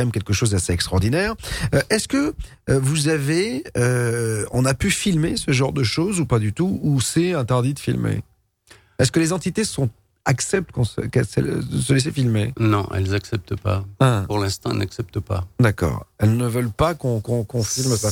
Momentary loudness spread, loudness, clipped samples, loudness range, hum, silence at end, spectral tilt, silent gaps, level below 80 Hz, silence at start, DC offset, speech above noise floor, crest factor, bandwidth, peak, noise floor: 6 LU; -21 LUFS; under 0.1%; 2 LU; none; 0 s; -5.5 dB/octave; none; -40 dBFS; 0 s; under 0.1%; 32 dB; 16 dB; 16.5 kHz; -4 dBFS; -52 dBFS